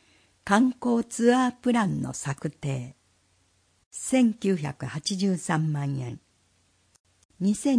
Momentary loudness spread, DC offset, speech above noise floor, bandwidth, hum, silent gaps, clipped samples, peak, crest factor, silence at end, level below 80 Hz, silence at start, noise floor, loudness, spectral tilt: 12 LU; under 0.1%; 41 dB; 10.5 kHz; none; 3.86-3.91 s, 7.00-7.04 s, 7.25-7.29 s; under 0.1%; -8 dBFS; 20 dB; 0 s; -62 dBFS; 0.45 s; -67 dBFS; -26 LUFS; -5.5 dB/octave